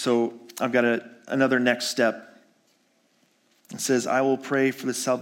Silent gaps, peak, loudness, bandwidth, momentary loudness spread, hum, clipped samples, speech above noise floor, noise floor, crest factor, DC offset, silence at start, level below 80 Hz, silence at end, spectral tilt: none; -6 dBFS; -24 LUFS; 17 kHz; 8 LU; none; under 0.1%; 42 dB; -66 dBFS; 20 dB; under 0.1%; 0 s; -80 dBFS; 0 s; -4 dB/octave